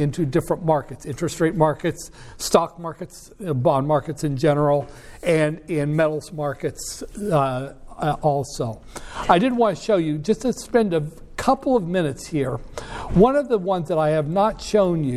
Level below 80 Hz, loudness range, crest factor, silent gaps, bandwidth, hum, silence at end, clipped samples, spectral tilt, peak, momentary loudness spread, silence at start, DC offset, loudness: -42 dBFS; 3 LU; 20 dB; none; 14.5 kHz; none; 0 s; under 0.1%; -6 dB/octave; -2 dBFS; 14 LU; 0 s; under 0.1%; -22 LUFS